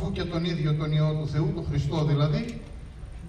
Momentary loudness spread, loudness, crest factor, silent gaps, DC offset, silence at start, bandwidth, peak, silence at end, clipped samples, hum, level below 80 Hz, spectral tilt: 17 LU; -27 LUFS; 14 dB; none; under 0.1%; 0 s; 9.4 kHz; -12 dBFS; 0 s; under 0.1%; none; -42 dBFS; -8 dB/octave